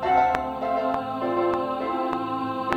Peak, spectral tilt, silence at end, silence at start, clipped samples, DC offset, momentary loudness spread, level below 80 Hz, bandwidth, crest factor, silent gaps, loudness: -2 dBFS; -6.5 dB/octave; 0 s; 0 s; under 0.1%; under 0.1%; 6 LU; -52 dBFS; 15.5 kHz; 22 dB; none; -25 LUFS